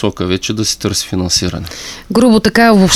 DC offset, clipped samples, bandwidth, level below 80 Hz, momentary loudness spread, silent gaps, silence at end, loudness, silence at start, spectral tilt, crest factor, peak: under 0.1%; under 0.1%; 15 kHz; -36 dBFS; 13 LU; none; 0 s; -12 LUFS; 0 s; -4 dB/octave; 12 dB; 0 dBFS